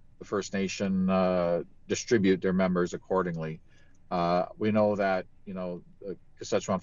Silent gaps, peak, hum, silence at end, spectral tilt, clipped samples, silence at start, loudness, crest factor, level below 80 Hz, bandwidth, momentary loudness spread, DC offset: none; -12 dBFS; none; 0 s; -6 dB/octave; under 0.1%; 0.2 s; -29 LUFS; 16 dB; -58 dBFS; 7.6 kHz; 15 LU; under 0.1%